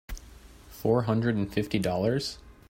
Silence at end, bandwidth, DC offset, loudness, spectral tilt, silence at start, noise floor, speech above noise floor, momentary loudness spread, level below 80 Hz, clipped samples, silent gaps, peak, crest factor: 0.2 s; 16 kHz; under 0.1%; -28 LUFS; -6.5 dB/octave; 0.1 s; -50 dBFS; 23 dB; 20 LU; -48 dBFS; under 0.1%; none; -12 dBFS; 18 dB